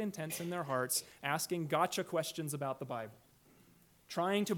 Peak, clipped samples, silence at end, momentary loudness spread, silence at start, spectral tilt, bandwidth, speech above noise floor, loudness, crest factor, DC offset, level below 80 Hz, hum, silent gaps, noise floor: -18 dBFS; under 0.1%; 0 s; 9 LU; 0 s; -4 dB/octave; 19 kHz; 29 dB; -37 LUFS; 20 dB; under 0.1%; -78 dBFS; none; none; -66 dBFS